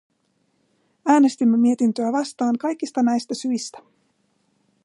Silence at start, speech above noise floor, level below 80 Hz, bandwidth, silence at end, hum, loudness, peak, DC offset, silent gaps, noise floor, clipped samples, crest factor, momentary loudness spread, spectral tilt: 1.05 s; 48 dB; -76 dBFS; 11 kHz; 1.05 s; none; -21 LUFS; -6 dBFS; under 0.1%; none; -68 dBFS; under 0.1%; 16 dB; 9 LU; -5 dB/octave